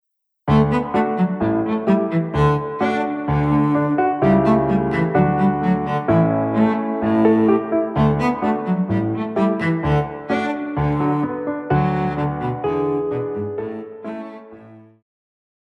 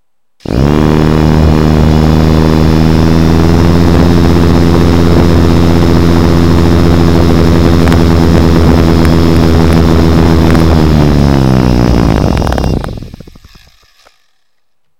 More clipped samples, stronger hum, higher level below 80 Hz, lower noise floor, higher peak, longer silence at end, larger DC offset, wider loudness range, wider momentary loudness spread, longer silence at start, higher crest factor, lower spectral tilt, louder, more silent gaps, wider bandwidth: second, under 0.1% vs 5%; neither; second, -40 dBFS vs -14 dBFS; second, -43 dBFS vs -67 dBFS; second, -4 dBFS vs 0 dBFS; first, 0.85 s vs 0 s; second, under 0.1% vs 20%; about the same, 5 LU vs 3 LU; first, 8 LU vs 2 LU; first, 0.45 s vs 0 s; first, 16 dB vs 8 dB; first, -9.5 dB/octave vs -7.5 dB/octave; second, -19 LUFS vs -7 LUFS; neither; second, 7.8 kHz vs 16 kHz